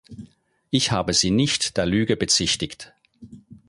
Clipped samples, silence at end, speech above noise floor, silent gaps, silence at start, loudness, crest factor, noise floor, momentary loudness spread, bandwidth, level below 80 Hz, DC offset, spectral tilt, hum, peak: under 0.1%; 0.1 s; 30 dB; none; 0.1 s; -21 LUFS; 20 dB; -52 dBFS; 7 LU; 11.5 kHz; -46 dBFS; under 0.1%; -3.5 dB/octave; none; -4 dBFS